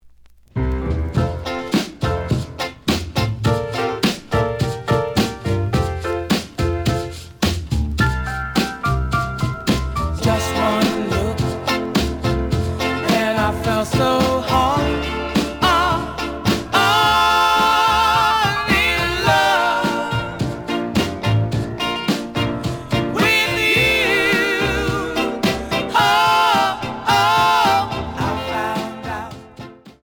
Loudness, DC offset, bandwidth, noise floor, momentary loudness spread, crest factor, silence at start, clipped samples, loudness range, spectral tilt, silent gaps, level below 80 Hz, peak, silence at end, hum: -18 LUFS; under 0.1%; over 20 kHz; -46 dBFS; 9 LU; 16 dB; 0.05 s; under 0.1%; 6 LU; -5 dB/octave; none; -32 dBFS; -2 dBFS; 0.15 s; none